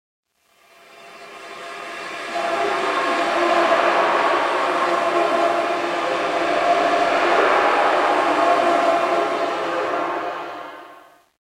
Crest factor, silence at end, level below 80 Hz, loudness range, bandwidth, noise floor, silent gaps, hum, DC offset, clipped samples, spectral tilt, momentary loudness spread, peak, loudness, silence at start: 18 dB; 0.5 s; -70 dBFS; 4 LU; 13.5 kHz; -57 dBFS; none; none; under 0.1%; under 0.1%; -3 dB/octave; 16 LU; -2 dBFS; -19 LUFS; 0.95 s